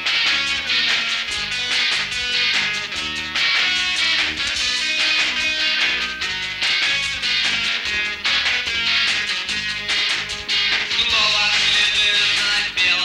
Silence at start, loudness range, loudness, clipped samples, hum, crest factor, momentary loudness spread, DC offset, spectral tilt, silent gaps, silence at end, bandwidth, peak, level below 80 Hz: 0 s; 2 LU; -17 LUFS; under 0.1%; none; 12 dB; 6 LU; under 0.1%; 0.5 dB/octave; none; 0 s; 16 kHz; -8 dBFS; -48 dBFS